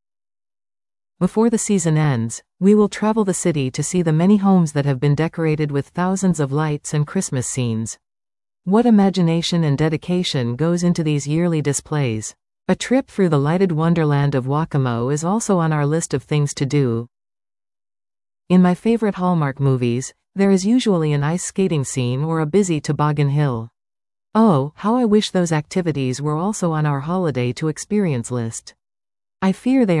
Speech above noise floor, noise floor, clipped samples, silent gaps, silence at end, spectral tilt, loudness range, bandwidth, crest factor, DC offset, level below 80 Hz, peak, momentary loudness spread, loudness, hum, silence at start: over 72 dB; under -90 dBFS; under 0.1%; none; 0 s; -6 dB/octave; 3 LU; 12 kHz; 14 dB; under 0.1%; -52 dBFS; -4 dBFS; 7 LU; -19 LUFS; none; 1.2 s